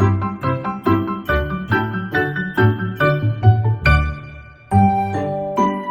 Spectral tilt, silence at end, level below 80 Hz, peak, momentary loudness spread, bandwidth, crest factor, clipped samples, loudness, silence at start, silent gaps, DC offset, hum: -8 dB/octave; 0 s; -30 dBFS; -2 dBFS; 7 LU; 16 kHz; 16 dB; under 0.1%; -18 LUFS; 0 s; none; under 0.1%; none